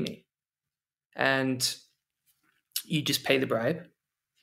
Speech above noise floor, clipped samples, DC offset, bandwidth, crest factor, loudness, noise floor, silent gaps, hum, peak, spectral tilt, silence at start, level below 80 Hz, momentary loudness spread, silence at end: over 62 dB; under 0.1%; under 0.1%; 16 kHz; 24 dB; -28 LUFS; under -90 dBFS; 1.06-1.10 s; none; -8 dBFS; -3.5 dB/octave; 0 s; -72 dBFS; 12 LU; 0.6 s